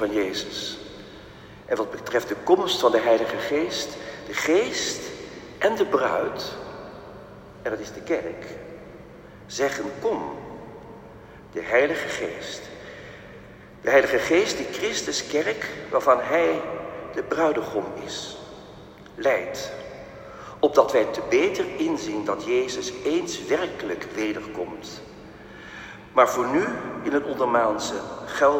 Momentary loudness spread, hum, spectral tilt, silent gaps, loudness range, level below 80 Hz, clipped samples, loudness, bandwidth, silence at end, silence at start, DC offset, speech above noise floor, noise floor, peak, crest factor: 22 LU; none; -3.5 dB/octave; none; 7 LU; -56 dBFS; under 0.1%; -24 LUFS; 16 kHz; 0 s; 0 s; under 0.1%; 21 dB; -45 dBFS; -2 dBFS; 22 dB